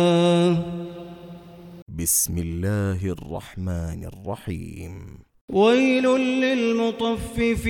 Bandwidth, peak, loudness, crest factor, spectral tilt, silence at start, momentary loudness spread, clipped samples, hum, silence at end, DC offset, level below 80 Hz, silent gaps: 18.5 kHz; -6 dBFS; -22 LUFS; 16 dB; -5 dB/octave; 0 s; 21 LU; under 0.1%; none; 0 s; under 0.1%; -42 dBFS; 1.82-1.86 s, 5.41-5.48 s